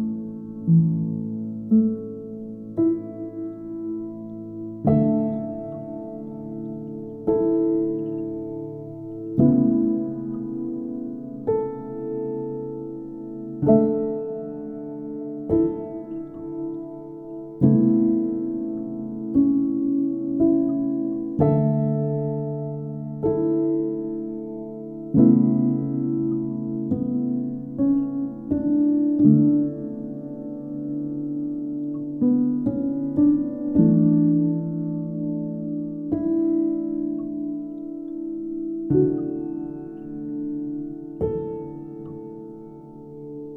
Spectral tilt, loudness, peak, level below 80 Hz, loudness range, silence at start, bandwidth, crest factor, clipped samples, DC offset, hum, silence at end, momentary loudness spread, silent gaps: -14 dB/octave; -24 LUFS; -4 dBFS; -54 dBFS; 6 LU; 0 s; 2.1 kHz; 20 dB; under 0.1%; under 0.1%; none; 0 s; 16 LU; none